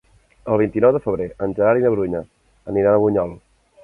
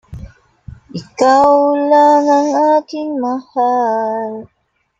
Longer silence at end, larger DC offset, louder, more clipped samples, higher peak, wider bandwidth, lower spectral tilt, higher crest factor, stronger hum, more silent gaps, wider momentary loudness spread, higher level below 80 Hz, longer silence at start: about the same, 0.45 s vs 0.55 s; neither; second, -19 LUFS vs -13 LUFS; neither; about the same, -2 dBFS vs 0 dBFS; second, 3.4 kHz vs 7.8 kHz; first, -10.5 dB/octave vs -5.5 dB/octave; about the same, 16 dB vs 14 dB; neither; neither; second, 13 LU vs 17 LU; about the same, -48 dBFS vs -46 dBFS; first, 0.45 s vs 0.1 s